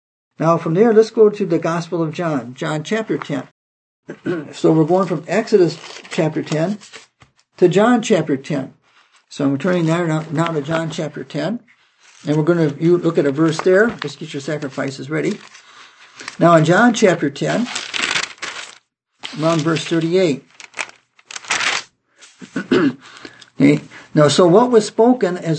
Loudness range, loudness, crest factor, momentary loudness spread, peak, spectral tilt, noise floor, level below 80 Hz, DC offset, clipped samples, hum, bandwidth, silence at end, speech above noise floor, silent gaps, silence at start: 4 LU; -17 LUFS; 18 dB; 16 LU; 0 dBFS; -5.5 dB/octave; -54 dBFS; -64 dBFS; under 0.1%; under 0.1%; none; 8.8 kHz; 0 s; 38 dB; 3.51-4.03 s; 0.4 s